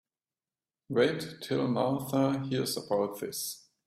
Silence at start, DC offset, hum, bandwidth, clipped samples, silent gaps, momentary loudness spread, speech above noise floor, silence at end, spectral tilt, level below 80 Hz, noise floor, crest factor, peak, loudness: 0.9 s; under 0.1%; none; 16 kHz; under 0.1%; none; 7 LU; over 60 dB; 0.3 s; -5 dB/octave; -70 dBFS; under -90 dBFS; 18 dB; -14 dBFS; -31 LUFS